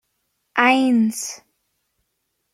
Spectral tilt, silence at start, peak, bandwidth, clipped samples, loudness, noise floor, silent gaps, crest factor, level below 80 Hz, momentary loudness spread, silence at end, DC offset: -3.5 dB/octave; 0.55 s; -2 dBFS; 14.5 kHz; under 0.1%; -18 LUFS; -74 dBFS; none; 20 dB; -72 dBFS; 15 LU; 1.2 s; under 0.1%